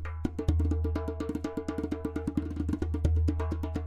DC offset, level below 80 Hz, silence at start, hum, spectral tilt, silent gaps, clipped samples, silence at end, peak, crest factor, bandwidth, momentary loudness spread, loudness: under 0.1%; -34 dBFS; 0 s; none; -8.5 dB/octave; none; under 0.1%; 0 s; -14 dBFS; 16 dB; 8.4 kHz; 6 LU; -32 LUFS